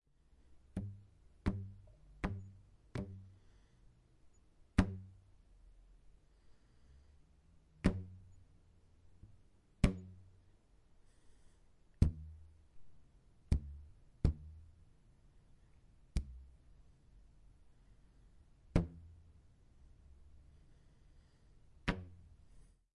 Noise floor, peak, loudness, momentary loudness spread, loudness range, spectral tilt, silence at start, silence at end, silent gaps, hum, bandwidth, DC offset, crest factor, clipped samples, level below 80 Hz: -67 dBFS; -14 dBFS; -41 LUFS; 26 LU; 8 LU; -7.5 dB/octave; 0.55 s; 0.35 s; none; none; 11 kHz; under 0.1%; 30 dB; under 0.1%; -48 dBFS